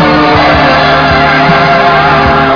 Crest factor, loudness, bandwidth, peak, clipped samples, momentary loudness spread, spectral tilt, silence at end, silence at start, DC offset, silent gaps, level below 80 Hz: 6 dB; -6 LUFS; 5.4 kHz; 0 dBFS; 4%; 1 LU; -6.5 dB/octave; 0 s; 0 s; under 0.1%; none; -24 dBFS